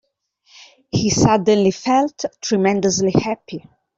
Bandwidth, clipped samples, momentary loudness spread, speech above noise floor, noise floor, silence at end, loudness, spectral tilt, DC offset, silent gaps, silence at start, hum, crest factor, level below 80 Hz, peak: 8 kHz; under 0.1%; 11 LU; 44 dB; -61 dBFS; 0.4 s; -18 LUFS; -5 dB/octave; under 0.1%; none; 0.95 s; none; 16 dB; -48 dBFS; -2 dBFS